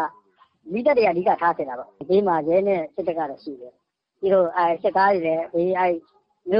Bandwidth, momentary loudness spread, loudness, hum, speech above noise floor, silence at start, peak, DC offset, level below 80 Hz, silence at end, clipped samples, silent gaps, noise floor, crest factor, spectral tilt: 5.6 kHz; 12 LU; -22 LUFS; none; 37 dB; 0 s; -6 dBFS; under 0.1%; -64 dBFS; 0 s; under 0.1%; none; -58 dBFS; 16 dB; -9.5 dB/octave